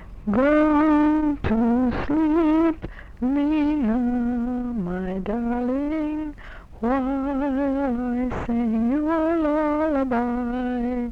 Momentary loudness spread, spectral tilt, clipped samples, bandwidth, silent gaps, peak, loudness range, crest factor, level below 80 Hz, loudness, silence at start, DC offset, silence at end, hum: 9 LU; -8.5 dB/octave; under 0.1%; 5.4 kHz; none; -10 dBFS; 5 LU; 12 dB; -40 dBFS; -23 LUFS; 0 s; under 0.1%; 0 s; none